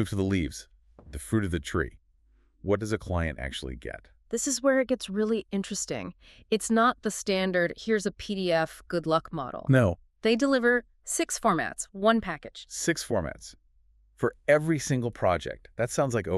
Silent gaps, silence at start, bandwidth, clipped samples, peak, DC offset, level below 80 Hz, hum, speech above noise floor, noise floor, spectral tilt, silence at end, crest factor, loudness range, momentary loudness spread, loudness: none; 0 s; 13.5 kHz; under 0.1%; -8 dBFS; under 0.1%; -48 dBFS; none; 36 dB; -63 dBFS; -5 dB/octave; 0 s; 20 dB; 5 LU; 13 LU; -28 LUFS